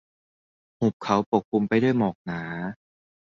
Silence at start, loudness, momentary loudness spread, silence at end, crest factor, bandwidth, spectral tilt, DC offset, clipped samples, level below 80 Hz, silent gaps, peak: 0.8 s; -25 LUFS; 11 LU; 0.5 s; 20 dB; 7.2 kHz; -7.5 dB/octave; under 0.1%; under 0.1%; -60 dBFS; 0.93-1.00 s, 1.26-1.32 s, 1.45-1.52 s, 2.15-2.25 s; -6 dBFS